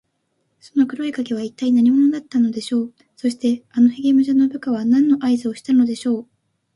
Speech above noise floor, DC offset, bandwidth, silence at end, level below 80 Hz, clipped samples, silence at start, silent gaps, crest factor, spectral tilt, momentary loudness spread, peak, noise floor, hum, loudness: 52 dB; under 0.1%; 11.5 kHz; 0.5 s; -66 dBFS; under 0.1%; 0.75 s; none; 14 dB; -6 dB/octave; 10 LU; -6 dBFS; -70 dBFS; none; -19 LUFS